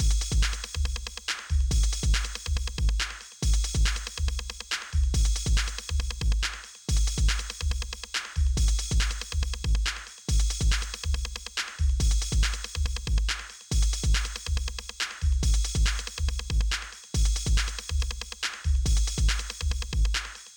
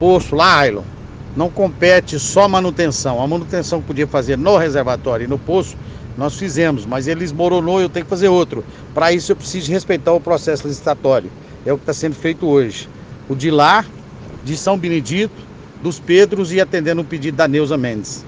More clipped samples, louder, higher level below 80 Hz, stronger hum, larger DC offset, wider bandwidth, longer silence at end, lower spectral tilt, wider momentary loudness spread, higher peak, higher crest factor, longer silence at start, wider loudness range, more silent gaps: neither; second, -29 LUFS vs -16 LUFS; first, -28 dBFS vs -42 dBFS; neither; neither; first, 18.5 kHz vs 9.8 kHz; about the same, 0 s vs 0 s; second, -3 dB/octave vs -5 dB/octave; second, 6 LU vs 14 LU; second, -14 dBFS vs 0 dBFS; about the same, 12 dB vs 16 dB; about the same, 0 s vs 0 s; about the same, 1 LU vs 3 LU; neither